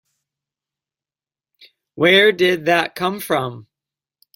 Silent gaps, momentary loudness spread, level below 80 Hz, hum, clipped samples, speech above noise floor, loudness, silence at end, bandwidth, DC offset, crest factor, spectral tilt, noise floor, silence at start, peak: none; 11 LU; -64 dBFS; none; under 0.1%; over 73 dB; -16 LUFS; 0.75 s; 16.5 kHz; under 0.1%; 20 dB; -4.5 dB/octave; under -90 dBFS; 1.95 s; 0 dBFS